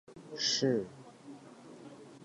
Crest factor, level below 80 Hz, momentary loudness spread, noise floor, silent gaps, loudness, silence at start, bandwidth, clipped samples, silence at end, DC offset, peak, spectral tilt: 18 dB; -76 dBFS; 23 LU; -53 dBFS; none; -32 LUFS; 0.1 s; 11.5 kHz; under 0.1%; 0 s; under 0.1%; -18 dBFS; -3.5 dB/octave